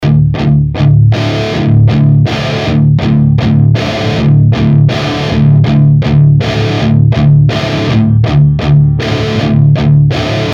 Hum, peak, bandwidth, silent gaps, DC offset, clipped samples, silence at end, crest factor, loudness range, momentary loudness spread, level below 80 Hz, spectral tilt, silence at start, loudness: none; 0 dBFS; 7.2 kHz; none; under 0.1%; under 0.1%; 0 s; 8 dB; 1 LU; 5 LU; -26 dBFS; -8 dB/octave; 0 s; -9 LUFS